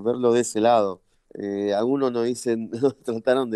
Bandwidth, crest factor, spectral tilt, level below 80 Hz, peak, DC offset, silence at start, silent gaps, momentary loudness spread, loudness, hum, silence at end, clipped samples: 12.5 kHz; 16 dB; -5 dB/octave; -66 dBFS; -6 dBFS; under 0.1%; 0 s; none; 9 LU; -23 LUFS; none; 0 s; under 0.1%